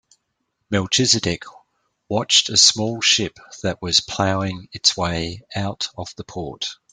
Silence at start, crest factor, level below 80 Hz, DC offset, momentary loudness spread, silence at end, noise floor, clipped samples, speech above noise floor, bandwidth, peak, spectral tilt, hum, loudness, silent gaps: 0.7 s; 22 dB; -52 dBFS; under 0.1%; 15 LU; 0.2 s; -74 dBFS; under 0.1%; 53 dB; 12 kHz; 0 dBFS; -2.5 dB/octave; none; -19 LUFS; none